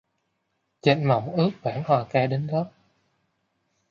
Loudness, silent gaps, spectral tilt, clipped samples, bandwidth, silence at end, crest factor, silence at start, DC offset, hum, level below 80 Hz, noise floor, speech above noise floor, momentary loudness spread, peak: -24 LUFS; none; -8 dB/octave; under 0.1%; 7 kHz; 1.2 s; 22 dB; 0.85 s; under 0.1%; none; -66 dBFS; -75 dBFS; 52 dB; 7 LU; -4 dBFS